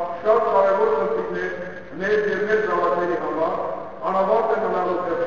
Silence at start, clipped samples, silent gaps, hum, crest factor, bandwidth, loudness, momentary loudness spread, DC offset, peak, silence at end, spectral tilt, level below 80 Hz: 0 s; under 0.1%; none; none; 16 dB; 7.2 kHz; -21 LUFS; 10 LU; 0.8%; -4 dBFS; 0 s; -6.5 dB/octave; -56 dBFS